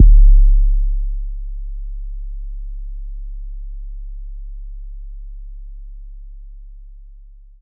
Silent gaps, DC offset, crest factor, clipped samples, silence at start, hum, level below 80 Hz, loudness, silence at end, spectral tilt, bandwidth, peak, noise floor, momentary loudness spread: none; under 0.1%; 16 dB; under 0.1%; 0 s; none; -16 dBFS; -21 LUFS; 0.7 s; -25 dB/octave; 0.2 kHz; 0 dBFS; -40 dBFS; 25 LU